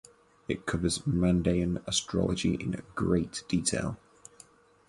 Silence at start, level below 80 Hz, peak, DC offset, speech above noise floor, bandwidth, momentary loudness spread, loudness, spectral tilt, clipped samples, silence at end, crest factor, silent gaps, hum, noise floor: 0.5 s; -46 dBFS; -12 dBFS; under 0.1%; 29 dB; 11.5 kHz; 9 LU; -30 LUFS; -5 dB/octave; under 0.1%; 0.9 s; 18 dB; none; none; -58 dBFS